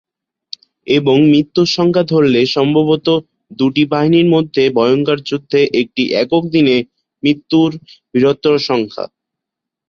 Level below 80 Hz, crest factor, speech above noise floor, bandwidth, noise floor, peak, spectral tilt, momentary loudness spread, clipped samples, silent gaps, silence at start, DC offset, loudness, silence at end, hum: -54 dBFS; 12 dB; 69 dB; 7.2 kHz; -82 dBFS; -2 dBFS; -6.5 dB/octave; 10 LU; under 0.1%; none; 0.85 s; under 0.1%; -13 LUFS; 0.8 s; none